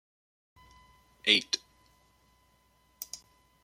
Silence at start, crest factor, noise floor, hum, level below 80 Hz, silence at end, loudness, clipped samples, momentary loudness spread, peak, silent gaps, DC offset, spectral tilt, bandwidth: 1.25 s; 30 dB; -68 dBFS; none; -70 dBFS; 0.5 s; -29 LUFS; under 0.1%; 20 LU; -6 dBFS; none; under 0.1%; -0.5 dB/octave; 16.5 kHz